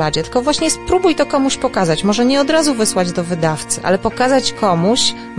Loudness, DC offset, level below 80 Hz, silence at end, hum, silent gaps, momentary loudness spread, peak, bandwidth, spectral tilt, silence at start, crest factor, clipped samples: -15 LUFS; 1%; -40 dBFS; 0 s; none; none; 5 LU; -2 dBFS; 11.5 kHz; -4 dB/octave; 0 s; 12 dB; under 0.1%